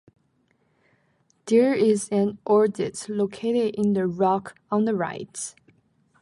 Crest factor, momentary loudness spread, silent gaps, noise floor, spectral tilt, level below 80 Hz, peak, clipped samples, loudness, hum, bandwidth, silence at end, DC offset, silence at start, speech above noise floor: 16 dB; 12 LU; none; -67 dBFS; -6 dB/octave; -68 dBFS; -8 dBFS; under 0.1%; -24 LUFS; none; 11.5 kHz; 0.7 s; under 0.1%; 1.45 s; 44 dB